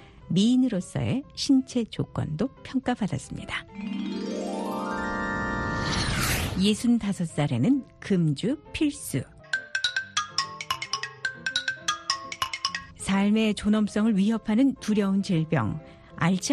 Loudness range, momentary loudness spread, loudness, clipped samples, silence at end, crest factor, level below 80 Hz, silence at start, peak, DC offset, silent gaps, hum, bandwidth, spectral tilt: 5 LU; 9 LU; -27 LUFS; under 0.1%; 0 s; 18 dB; -48 dBFS; 0 s; -10 dBFS; under 0.1%; none; none; 13 kHz; -5 dB/octave